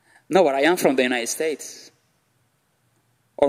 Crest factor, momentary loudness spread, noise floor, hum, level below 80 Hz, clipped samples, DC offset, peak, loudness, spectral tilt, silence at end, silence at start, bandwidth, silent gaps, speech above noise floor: 22 dB; 16 LU; -67 dBFS; none; -68 dBFS; under 0.1%; under 0.1%; -2 dBFS; -20 LUFS; -3.5 dB/octave; 0 s; 0.3 s; 16 kHz; none; 46 dB